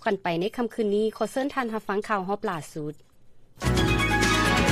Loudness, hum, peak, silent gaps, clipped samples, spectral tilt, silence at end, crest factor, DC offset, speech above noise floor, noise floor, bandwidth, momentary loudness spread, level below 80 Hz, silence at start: -26 LUFS; none; -10 dBFS; none; under 0.1%; -5 dB/octave; 0 s; 16 dB; under 0.1%; 22 dB; -49 dBFS; 15.5 kHz; 11 LU; -38 dBFS; 0 s